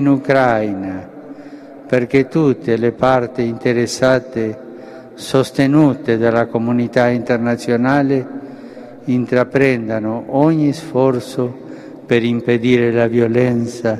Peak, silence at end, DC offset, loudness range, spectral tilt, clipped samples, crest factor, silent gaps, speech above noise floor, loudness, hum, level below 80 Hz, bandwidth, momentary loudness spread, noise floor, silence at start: 0 dBFS; 0 s; under 0.1%; 2 LU; -7 dB/octave; under 0.1%; 16 dB; none; 20 dB; -16 LUFS; none; -52 dBFS; 13 kHz; 19 LU; -35 dBFS; 0 s